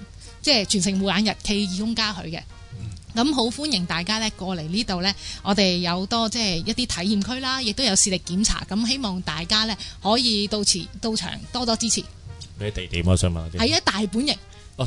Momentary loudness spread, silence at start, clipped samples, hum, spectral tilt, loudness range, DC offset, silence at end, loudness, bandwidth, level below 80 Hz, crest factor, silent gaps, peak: 11 LU; 0 s; under 0.1%; none; -3.5 dB/octave; 3 LU; under 0.1%; 0 s; -22 LUFS; 11 kHz; -42 dBFS; 18 dB; none; -4 dBFS